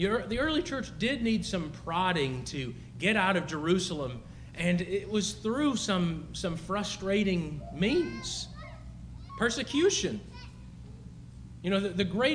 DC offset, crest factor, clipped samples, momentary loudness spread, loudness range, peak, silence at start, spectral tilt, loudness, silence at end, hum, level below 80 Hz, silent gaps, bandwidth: under 0.1%; 18 dB; under 0.1%; 19 LU; 3 LU; -12 dBFS; 0 s; -4.5 dB/octave; -30 LUFS; 0 s; 60 Hz at -50 dBFS; -50 dBFS; none; 10.5 kHz